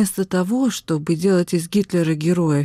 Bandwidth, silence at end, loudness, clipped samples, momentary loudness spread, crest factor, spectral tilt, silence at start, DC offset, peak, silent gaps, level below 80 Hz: 15.5 kHz; 0 s; -20 LUFS; under 0.1%; 3 LU; 10 dB; -6 dB/octave; 0 s; under 0.1%; -8 dBFS; none; -58 dBFS